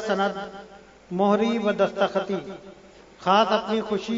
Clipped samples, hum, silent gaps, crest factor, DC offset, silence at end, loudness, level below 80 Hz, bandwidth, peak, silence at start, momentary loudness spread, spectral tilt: under 0.1%; none; none; 18 dB; under 0.1%; 0 s; -24 LUFS; -62 dBFS; 7.8 kHz; -6 dBFS; 0 s; 17 LU; -5.5 dB/octave